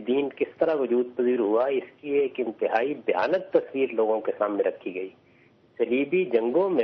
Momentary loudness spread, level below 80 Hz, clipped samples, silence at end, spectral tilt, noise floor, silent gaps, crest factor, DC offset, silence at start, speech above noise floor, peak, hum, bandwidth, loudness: 6 LU; -72 dBFS; under 0.1%; 0 s; -4 dB/octave; -58 dBFS; none; 18 dB; under 0.1%; 0 s; 34 dB; -8 dBFS; none; 5.8 kHz; -26 LUFS